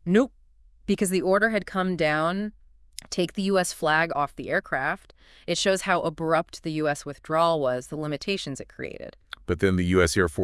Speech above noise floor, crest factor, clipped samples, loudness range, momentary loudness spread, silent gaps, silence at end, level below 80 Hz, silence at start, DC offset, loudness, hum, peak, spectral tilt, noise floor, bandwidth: 30 dB; 20 dB; under 0.1%; 2 LU; 14 LU; none; 0 s; -50 dBFS; 0.05 s; under 0.1%; -25 LUFS; none; -6 dBFS; -5 dB/octave; -55 dBFS; 12 kHz